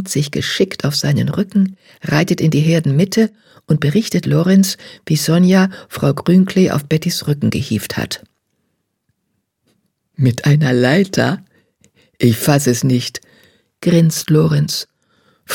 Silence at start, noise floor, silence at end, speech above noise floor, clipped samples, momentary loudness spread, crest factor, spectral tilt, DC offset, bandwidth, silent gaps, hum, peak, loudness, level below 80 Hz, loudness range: 0 s; -70 dBFS; 0 s; 56 dB; under 0.1%; 8 LU; 16 dB; -6 dB/octave; under 0.1%; 17.5 kHz; none; none; 0 dBFS; -15 LUFS; -52 dBFS; 5 LU